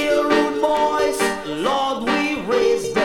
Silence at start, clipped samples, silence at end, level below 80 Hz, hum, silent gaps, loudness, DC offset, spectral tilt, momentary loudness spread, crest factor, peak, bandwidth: 0 s; under 0.1%; 0 s; -48 dBFS; none; none; -19 LUFS; under 0.1%; -3.5 dB/octave; 4 LU; 14 dB; -4 dBFS; 18.5 kHz